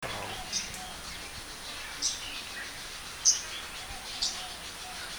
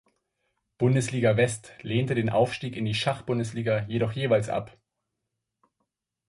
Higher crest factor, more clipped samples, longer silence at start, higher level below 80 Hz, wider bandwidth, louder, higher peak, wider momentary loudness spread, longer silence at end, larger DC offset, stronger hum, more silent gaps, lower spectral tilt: first, 26 dB vs 18 dB; neither; second, 0 s vs 0.8 s; about the same, -54 dBFS vs -58 dBFS; first, over 20 kHz vs 11.5 kHz; second, -33 LUFS vs -26 LUFS; about the same, -10 dBFS vs -10 dBFS; first, 14 LU vs 7 LU; second, 0 s vs 1.6 s; neither; neither; neither; second, 0.5 dB/octave vs -6 dB/octave